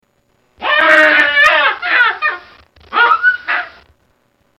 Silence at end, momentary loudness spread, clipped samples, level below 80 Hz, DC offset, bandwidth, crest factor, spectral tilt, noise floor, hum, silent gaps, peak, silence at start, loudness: 0.9 s; 12 LU; under 0.1%; -54 dBFS; under 0.1%; 15 kHz; 14 dB; -1.5 dB/octave; -59 dBFS; none; none; 0 dBFS; 0.6 s; -11 LUFS